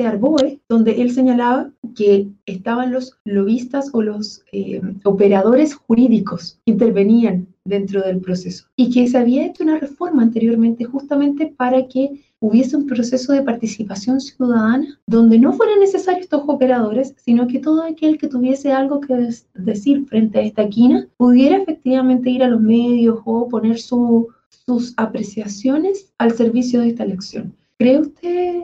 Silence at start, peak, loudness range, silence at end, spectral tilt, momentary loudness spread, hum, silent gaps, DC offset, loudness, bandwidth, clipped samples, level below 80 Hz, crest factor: 0 s; -4 dBFS; 4 LU; 0 s; -7 dB/octave; 11 LU; none; 1.78-1.82 s, 2.43-2.47 s, 3.20-3.25 s, 8.72-8.78 s, 15.02-15.07 s, 24.46-24.51 s; under 0.1%; -16 LUFS; 7.6 kHz; under 0.1%; -58 dBFS; 12 dB